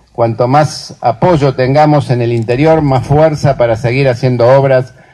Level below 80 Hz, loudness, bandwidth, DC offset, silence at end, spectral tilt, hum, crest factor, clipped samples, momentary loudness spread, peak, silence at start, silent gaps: -36 dBFS; -10 LUFS; 10.5 kHz; under 0.1%; 0.25 s; -7.5 dB/octave; none; 10 dB; under 0.1%; 5 LU; 0 dBFS; 0.2 s; none